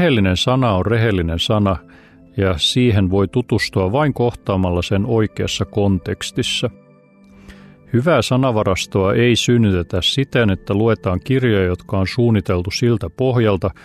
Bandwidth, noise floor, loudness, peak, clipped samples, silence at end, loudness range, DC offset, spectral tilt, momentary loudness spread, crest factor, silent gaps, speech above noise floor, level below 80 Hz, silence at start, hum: 13.5 kHz; -48 dBFS; -17 LUFS; -4 dBFS; under 0.1%; 0.15 s; 4 LU; under 0.1%; -6 dB/octave; 5 LU; 14 dB; none; 31 dB; -42 dBFS; 0 s; none